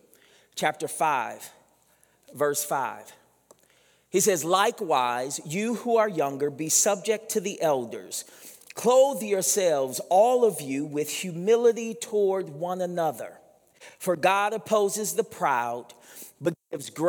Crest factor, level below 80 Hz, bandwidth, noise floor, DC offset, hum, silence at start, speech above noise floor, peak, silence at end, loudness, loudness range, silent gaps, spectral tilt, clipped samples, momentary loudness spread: 20 dB; -82 dBFS; over 20 kHz; -64 dBFS; under 0.1%; none; 0.55 s; 38 dB; -6 dBFS; 0 s; -25 LUFS; 6 LU; none; -3 dB/octave; under 0.1%; 15 LU